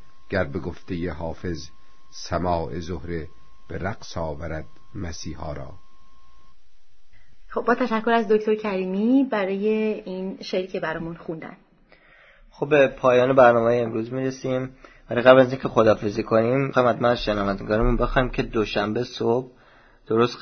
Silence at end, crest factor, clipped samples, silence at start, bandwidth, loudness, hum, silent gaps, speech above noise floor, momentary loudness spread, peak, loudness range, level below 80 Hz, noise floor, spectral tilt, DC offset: 0 s; 24 dB; under 0.1%; 0 s; 6.6 kHz; -23 LUFS; none; none; 37 dB; 17 LU; 0 dBFS; 14 LU; -40 dBFS; -59 dBFS; -6.5 dB/octave; under 0.1%